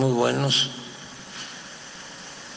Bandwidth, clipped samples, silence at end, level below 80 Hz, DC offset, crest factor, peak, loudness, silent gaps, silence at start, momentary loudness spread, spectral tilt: 10 kHz; under 0.1%; 0 s; -66 dBFS; under 0.1%; 18 dB; -8 dBFS; -24 LUFS; none; 0 s; 18 LU; -4 dB/octave